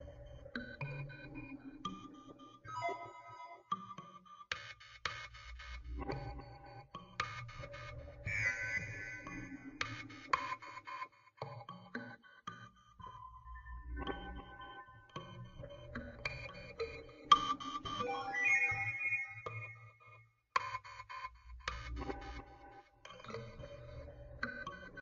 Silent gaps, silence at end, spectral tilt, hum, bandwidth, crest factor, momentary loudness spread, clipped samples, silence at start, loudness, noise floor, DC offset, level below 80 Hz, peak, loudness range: none; 0 s; -2 dB/octave; none; 7.4 kHz; 32 dB; 18 LU; under 0.1%; 0 s; -41 LUFS; -63 dBFS; under 0.1%; -56 dBFS; -12 dBFS; 15 LU